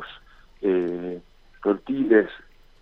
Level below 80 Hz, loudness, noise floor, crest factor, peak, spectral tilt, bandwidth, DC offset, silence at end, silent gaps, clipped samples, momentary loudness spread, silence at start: -54 dBFS; -24 LUFS; -49 dBFS; 20 dB; -6 dBFS; -8.5 dB/octave; 5.2 kHz; under 0.1%; 0.45 s; none; under 0.1%; 20 LU; 0 s